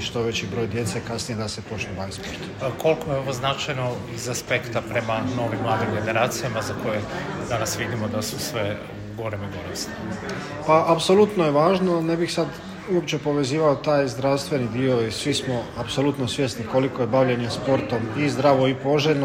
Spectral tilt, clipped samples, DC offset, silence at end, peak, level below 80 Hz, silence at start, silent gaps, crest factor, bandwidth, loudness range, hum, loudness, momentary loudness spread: -5 dB/octave; under 0.1%; under 0.1%; 0 s; -4 dBFS; -52 dBFS; 0 s; none; 18 dB; 16 kHz; 6 LU; none; -23 LUFS; 11 LU